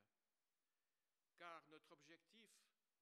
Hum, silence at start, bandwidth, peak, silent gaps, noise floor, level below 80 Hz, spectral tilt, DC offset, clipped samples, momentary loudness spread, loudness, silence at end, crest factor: none; 0 s; 12.5 kHz; -44 dBFS; none; under -90 dBFS; under -90 dBFS; -3 dB/octave; under 0.1%; under 0.1%; 9 LU; -64 LUFS; 0.3 s; 26 dB